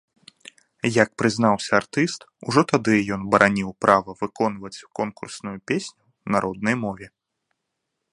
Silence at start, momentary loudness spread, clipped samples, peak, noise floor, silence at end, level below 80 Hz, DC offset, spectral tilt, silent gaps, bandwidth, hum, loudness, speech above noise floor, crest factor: 0.85 s; 15 LU; under 0.1%; 0 dBFS; -79 dBFS; 1.05 s; -58 dBFS; under 0.1%; -5 dB/octave; none; 11.5 kHz; none; -22 LUFS; 57 dB; 24 dB